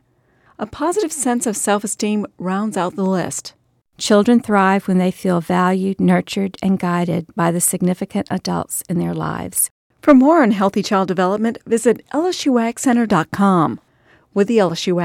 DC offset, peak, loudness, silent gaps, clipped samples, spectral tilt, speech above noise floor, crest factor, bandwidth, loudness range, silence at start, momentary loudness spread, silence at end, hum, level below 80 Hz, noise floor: under 0.1%; 0 dBFS; -17 LUFS; 9.71-9.90 s; under 0.1%; -5 dB/octave; 40 dB; 16 dB; 16 kHz; 4 LU; 0.6 s; 9 LU; 0 s; none; -54 dBFS; -57 dBFS